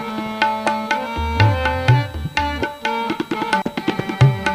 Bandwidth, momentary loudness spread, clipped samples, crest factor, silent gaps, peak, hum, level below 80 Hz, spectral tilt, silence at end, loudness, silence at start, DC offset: 15.5 kHz; 7 LU; under 0.1%; 18 dB; none; 0 dBFS; none; -36 dBFS; -6 dB/octave; 0 s; -19 LUFS; 0 s; under 0.1%